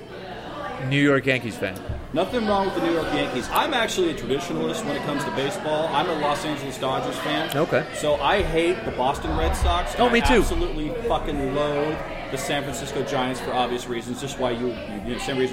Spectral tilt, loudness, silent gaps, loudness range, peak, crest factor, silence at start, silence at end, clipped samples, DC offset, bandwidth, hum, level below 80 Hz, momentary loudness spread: -5 dB/octave; -24 LUFS; none; 4 LU; -4 dBFS; 18 dB; 0 s; 0 s; under 0.1%; under 0.1%; 16 kHz; none; -34 dBFS; 9 LU